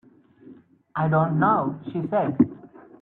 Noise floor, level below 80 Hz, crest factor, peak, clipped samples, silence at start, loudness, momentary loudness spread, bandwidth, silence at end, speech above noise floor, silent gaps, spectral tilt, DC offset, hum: -50 dBFS; -62 dBFS; 20 dB; -6 dBFS; under 0.1%; 0.45 s; -23 LUFS; 9 LU; 3.9 kHz; 0.35 s; 28 dB; none; -12 dB/octave; under 0.1%; none